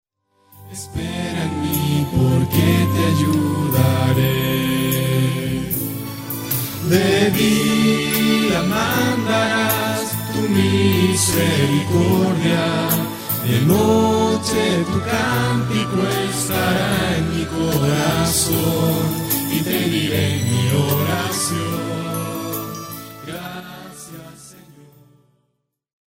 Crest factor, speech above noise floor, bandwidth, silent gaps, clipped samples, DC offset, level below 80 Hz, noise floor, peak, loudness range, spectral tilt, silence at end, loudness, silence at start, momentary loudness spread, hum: 18 dB; 54 dB; 16.5 kHz; none; under 0.1%; under 0.1%; -44 dBFS; -72 dBFS; 0 dBFS; 6 LU; -5 dB/octave; 1.6 s; -18 LUFS; 0.55 s; 11 LU; none